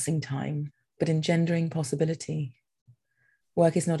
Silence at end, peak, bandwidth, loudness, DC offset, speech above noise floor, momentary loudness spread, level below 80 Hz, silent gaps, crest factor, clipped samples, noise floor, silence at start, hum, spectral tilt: 0 s; -10 dBFS; 12.5 kHz; -28 LUFS; under 0.1%; 44 dB; 10 LU; -66 dBFS; 2.81-2.86 s; 18 dB; under 0.1%; -71 dBFS; 0 s; none; -6 dB/octave